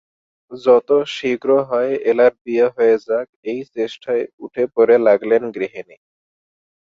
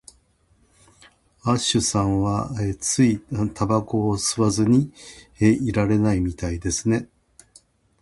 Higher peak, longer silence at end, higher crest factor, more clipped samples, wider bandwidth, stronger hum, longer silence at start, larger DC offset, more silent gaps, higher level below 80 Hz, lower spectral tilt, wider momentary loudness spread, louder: about the same, -2 dBFS vs -4 dBFS; about the same, 1 s vs 0.95 s; about the same, 16 dB vs 18 dB; neither; second, 7.4 kHz vs 11.5 kHz; neither; second, 0.5 s vs 1.45 s; neither; first, 2.41-2.45 s, 3.29-3.43 s, 4.33-4.38 s vs none; second, -66 dBFS vs -42 dBFS; about the same, -6 dB/octave vs -5 dB/octave; first, 13 LU vs 8 LU; first, -17 LUFS vs -22 LUFS